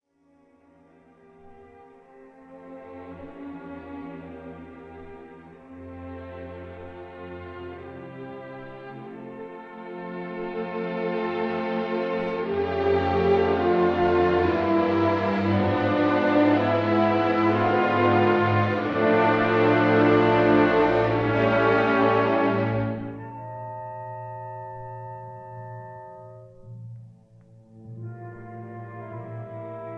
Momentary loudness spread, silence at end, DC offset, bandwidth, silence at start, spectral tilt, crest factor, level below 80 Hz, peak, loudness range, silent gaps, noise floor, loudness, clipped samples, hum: 21 LU; 0 s; under 0.1%; 6.6 kHz; 1.45 s; -8.5 dB/octave; 18 dB; -54 dBFS; -8 dBFS; 21 LU; none; -62 dBFS; -22 LUFS; under 0.1%; none